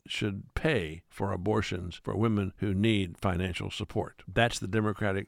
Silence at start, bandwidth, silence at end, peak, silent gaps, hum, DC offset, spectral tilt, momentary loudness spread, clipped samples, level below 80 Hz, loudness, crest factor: 0.05 s; 15 kHz; 0 s; -10 dBFS; none; none; under 0.1%; -6 dB/octave; 8 LU; under 0.1%; -50 dBFS; -31 LUFS; 20 dB